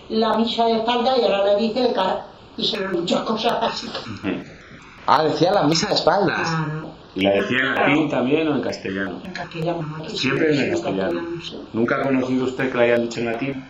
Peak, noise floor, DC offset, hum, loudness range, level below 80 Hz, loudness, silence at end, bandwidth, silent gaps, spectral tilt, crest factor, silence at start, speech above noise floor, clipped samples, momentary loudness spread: 0 dBFS; -42 dBFS; under 0.1%; none; 4 LU; -54 dBFS; -21 LUFS; 0 s; 10.5 kHz; none; -5 dB/octave; 20 dB; 0 s; 22 dB; under 0.1%; 10 LU